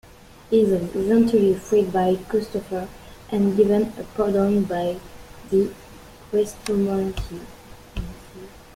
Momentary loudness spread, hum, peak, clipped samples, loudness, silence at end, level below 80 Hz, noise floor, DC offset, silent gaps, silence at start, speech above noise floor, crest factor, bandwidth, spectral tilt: 19 LU; none; -6 dBFS; under 0.1%; -22 LUFS; 0.25 s; -44 dBFS; -44 dBFS; under 0.1%; none; 0.5 s; 23 dB; 16 dB; 16 kHz; -7 dB/octave